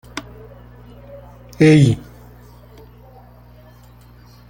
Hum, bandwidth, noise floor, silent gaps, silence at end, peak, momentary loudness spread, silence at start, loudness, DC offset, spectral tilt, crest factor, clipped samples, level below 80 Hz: 60 Hz at -40 dBFS; 16 kHz; -44 dBFS; none; 2.5 s; -2 dBFS; 29 LU; 0.15 s; -14 LUFS; under 0.1%; -7 dB/octave; 20 dB; under 0.1%; -46 dBFS